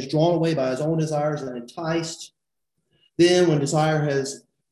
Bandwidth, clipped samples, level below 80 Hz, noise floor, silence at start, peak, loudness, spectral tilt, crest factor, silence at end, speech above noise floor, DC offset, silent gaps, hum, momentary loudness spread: 12 kHz; under 0.1%; -60 dBFS; -80 dBFS; 0 s; -6 dBFS; -22 LUFS; -5.5 dB/octave; 16 dB; 0.35 s; 58 dB; under 0.1%; none; none; 16 LU